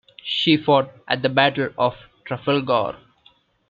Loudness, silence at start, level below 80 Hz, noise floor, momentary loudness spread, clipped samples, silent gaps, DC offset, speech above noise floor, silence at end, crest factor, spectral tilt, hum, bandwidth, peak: -20 LUFS; 0.25 s; -60 dBFS; -58 dBFS; 12 LU; under 0.1%; none; under 0.1%; 38 dB; 0.75 s; 22 dB; -7 dB/octave; none; 7.4 kHz; 0 dBFS